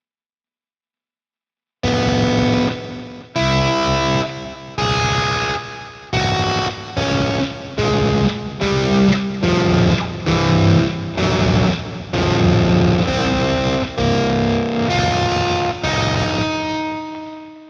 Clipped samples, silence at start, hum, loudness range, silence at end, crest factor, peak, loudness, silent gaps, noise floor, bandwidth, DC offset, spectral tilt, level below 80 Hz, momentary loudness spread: under 0.1%; 1.85 s; none; 3 LU; 0 s; 14 dB; -4 dBFS; -18 LUFS; none; under -90 dBFS; 8 kHz; under 0.1%; -5.5 dB/octave; -36 dBFS; 10 LU